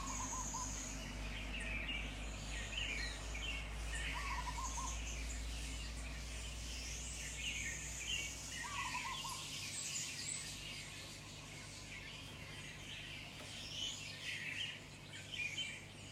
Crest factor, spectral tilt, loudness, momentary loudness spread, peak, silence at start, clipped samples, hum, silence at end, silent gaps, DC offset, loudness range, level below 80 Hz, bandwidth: 16 dB; -2 dB/octave; -44 LUFS; 8 LU; -30 dBFS; 0 s; under 0.1%; none; 0 s; none; under 0.1%; 4 LU; -50 dBFS; 16 kHz